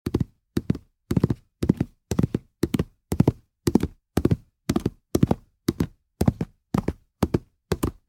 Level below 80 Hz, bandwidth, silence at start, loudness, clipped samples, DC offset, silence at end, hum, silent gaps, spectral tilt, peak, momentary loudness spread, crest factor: -40 dBFS; 17 kHz; 0.05 s; -27 LUFS; under 0.1%; under 0.1%; 0.15 s; none; none; -7.5 dB/octave; -2 dBFS; 7 LU; 24 dB